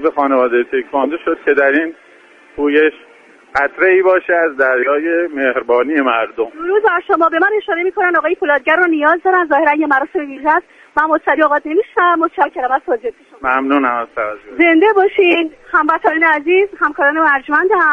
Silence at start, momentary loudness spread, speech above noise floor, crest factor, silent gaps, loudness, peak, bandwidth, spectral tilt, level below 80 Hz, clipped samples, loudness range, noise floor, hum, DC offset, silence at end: 0 s; 7 LU; 31 dB; 14 dB; none; -14 LUFS; 0 dBFS; 6.4 kHz; -5 dB/octave; -56 dBFS; under 0.1%; 3 LU; -44 dBFS; none; under 0.1%; 0 s